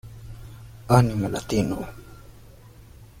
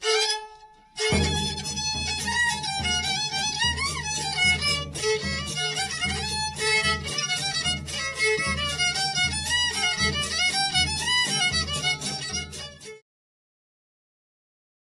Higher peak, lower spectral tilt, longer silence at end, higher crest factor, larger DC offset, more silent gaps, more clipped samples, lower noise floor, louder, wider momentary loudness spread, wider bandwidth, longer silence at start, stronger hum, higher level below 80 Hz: first, -4 dBFS vs -12 dBFS; first, -7 dB/octave vs -2 dB/octave; second, 0.15 s vs 1.8 s; first, 22 dB vs 16 dB; neither; neither; neither; about the same, -47 dBFS vs -50 dBFS; about the same, -23 LUFS vs -24 LUFS; first, 24 LU vs 6 LU; first, 16 kHz vs 14 kHz; about the same, 0.05 s vs 0 s; neither; about the same, -44 dBFS vs -44 dBFS